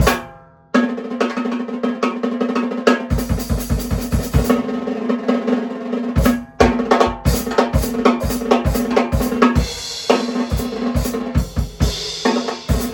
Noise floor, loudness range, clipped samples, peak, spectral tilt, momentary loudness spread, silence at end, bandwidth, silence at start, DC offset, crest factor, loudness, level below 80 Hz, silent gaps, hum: -41 dBFS; 3 LU; under 0.1%; 0 dBFS; -5.5 dB/octave; 6 LU; 0 s; 18 kHz; 0 s; under 0.1%; 18 dB; -19 LUFS; -28 dBFS; none; none